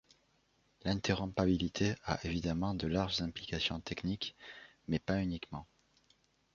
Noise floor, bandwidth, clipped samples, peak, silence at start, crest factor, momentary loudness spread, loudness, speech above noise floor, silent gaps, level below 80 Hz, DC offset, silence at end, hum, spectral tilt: -74 dBFS; 7.4 kHz; under 0.1%; -16 dBFS; 0.85 s; 22 dB; 11 LU; -36 LUFS; 38 dB; none; -54 dBFS; under 0.1%; 0.9 s; none; -4.5 dB/octave